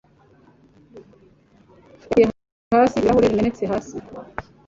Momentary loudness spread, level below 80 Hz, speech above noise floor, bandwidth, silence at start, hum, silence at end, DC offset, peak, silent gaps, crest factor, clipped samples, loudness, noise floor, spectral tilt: 18 LU; -48 dBFS; 34 dB; 7.8 kHz; 0.95 s; none; 0.25 s; under 0.1%; -4 dBFS; 2.52-2.71 s; 18 dB; under 0.1%; -19 LUFS; -54 dBFS; -7 dB/octave